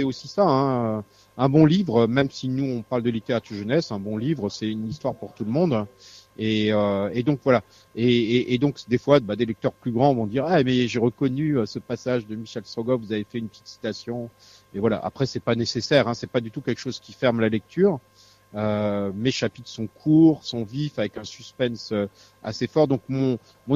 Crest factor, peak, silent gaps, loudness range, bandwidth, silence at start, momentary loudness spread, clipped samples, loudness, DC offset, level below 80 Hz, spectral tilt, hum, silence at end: 20 dB; -2 dBFS; none; 5 LU; 7.6 kHz; 0 s; 13 LU; under 0.1%; -24 LUFS; under 0.1%; -58 dBFS; -7 dB/octave; none; 0 s